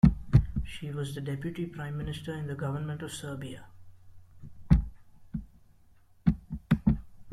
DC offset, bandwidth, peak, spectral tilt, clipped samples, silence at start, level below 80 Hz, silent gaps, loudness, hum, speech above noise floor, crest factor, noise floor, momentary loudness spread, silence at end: under 0.1%; 13 kHz; -6 dBFS; -7.5 dB/octave; under 0.1%; 0.05 s; -38 dBFS; none; -32 LUFS; none; 23 dB; 24 dB; -59 dBFS; 16 LU; 0 s